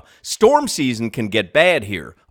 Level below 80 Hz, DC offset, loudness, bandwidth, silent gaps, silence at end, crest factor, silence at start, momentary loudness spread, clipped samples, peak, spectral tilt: -52 dBFS; under 0.1%; -17 LUFS; 19 kHz; none; 0.2 s; 18 dB; 0.25 s; 13 LU; under 0.1%; 0 dBFS; -4 dB/octave